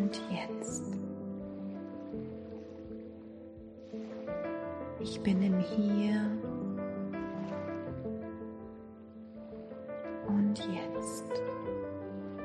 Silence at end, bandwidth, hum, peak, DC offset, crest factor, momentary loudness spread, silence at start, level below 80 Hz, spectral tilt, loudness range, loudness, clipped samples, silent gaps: 0 s; 11 kHz; none; -18 dBFS; under 0.1%; 18 dB; 17 LU; 0 s; -64 dBFS; -6.5 dB/octave; 9 LU; -37 LUFS; under 0.1%; none